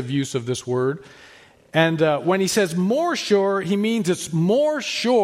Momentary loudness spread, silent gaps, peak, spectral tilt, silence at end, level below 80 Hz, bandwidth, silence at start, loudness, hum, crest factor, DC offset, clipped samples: 6 LU; none; -4 dBFS; -5 dB/octave; 0 s; -64 dBFS; 16 kHz; 0 s; -21 LUFS; none; 16 dB; under 0.1%; under 0.1%